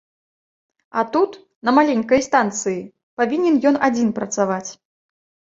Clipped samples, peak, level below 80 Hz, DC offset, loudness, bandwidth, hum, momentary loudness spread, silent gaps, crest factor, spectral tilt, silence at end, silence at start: under 0.1%; -2 dBFS; -60 dBFS; under 0.1%; -19 LUFS; 7.8 kHz; none; 11 LU; 1.55-1.62 s, 3.03-3.17 s; 18 dB; -4.5 dB/octave; 0.85 s; 0.95 s